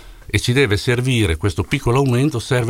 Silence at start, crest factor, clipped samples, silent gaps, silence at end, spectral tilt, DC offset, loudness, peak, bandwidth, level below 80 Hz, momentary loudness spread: 0 s; 14 dB; under 0.1%; none; 0 s; -5.5 dB/octave; under 0.1%; -18 LUFS; -4 dBFS; 16 kHz; -34 dBFS; 5 LU